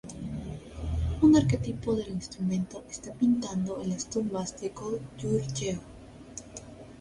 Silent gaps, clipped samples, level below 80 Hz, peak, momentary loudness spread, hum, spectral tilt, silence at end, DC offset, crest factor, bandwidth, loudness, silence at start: none; under 0.1%; -44 dBFS; -10 dBFS; 19 LU; none; -6.5 dB/octave; 0 s; under 0.1%; 18 dB; 11.5 kHz; -30 LUFS; 0.05 s